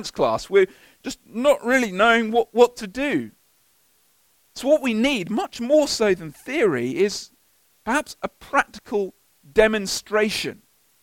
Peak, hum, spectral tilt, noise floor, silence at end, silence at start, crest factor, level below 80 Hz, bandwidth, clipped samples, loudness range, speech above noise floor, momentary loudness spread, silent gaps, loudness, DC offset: -2 dBFS; none; -4 dB/octave; -62 dBFS; 0.5 s; 0 s; 20 dB; -52 dBFS; 17 kHz; under 0.1%; 3 LU; 41 dB; 14 LU; none; -21 LUFS; under 0.1%